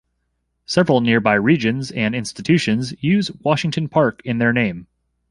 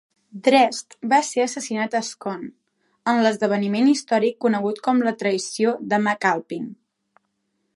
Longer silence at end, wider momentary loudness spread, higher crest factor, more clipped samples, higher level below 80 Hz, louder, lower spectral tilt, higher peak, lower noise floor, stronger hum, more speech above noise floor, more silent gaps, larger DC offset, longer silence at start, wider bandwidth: second, 0.45 s vs 1 s; second, 6 LU vs 12 LU; about the same, 18 dB vs 20 dB; neither; first, -52 dBFS vs -76 dBFS; first, -18 LUFS vs -21 LUFS; first, -6 dB/octave vs -4.5 dB/octave; about the same, -2 dBFS vs -2 dBFS; about the same, -71 dBFS vs -73 dBFS; neither; about the same, 53 dB vs 52 dB; neither; neither; first, 0.7 s vs 0.35 s; about the same, 11.5 kHz vs 11.5 kHz